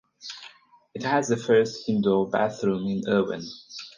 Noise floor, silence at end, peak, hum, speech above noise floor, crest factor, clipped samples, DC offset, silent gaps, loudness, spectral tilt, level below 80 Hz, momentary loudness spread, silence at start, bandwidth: -52 dBFS; 0.05 s; -8 dBFS; none; 28 dB; 18 dB; under 0.1%; under 0.1%; none; -25 LUFS; -5.5 dB/octave; -64 dBFS; 17 LU; 0.2 s; 9.8 kHz